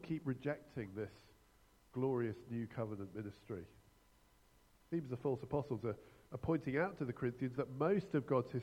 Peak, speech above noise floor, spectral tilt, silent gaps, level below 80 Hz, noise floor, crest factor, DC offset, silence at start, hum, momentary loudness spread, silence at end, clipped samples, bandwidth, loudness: -22 dBFS; 29 dB; -9 dB/octave; none; -68 dBFS; -69 dBFS; 20 dB; under 0.1%; 0 s; none; 13 LU; 0 s; under 0.1%; 16 kHz; -41 LUFS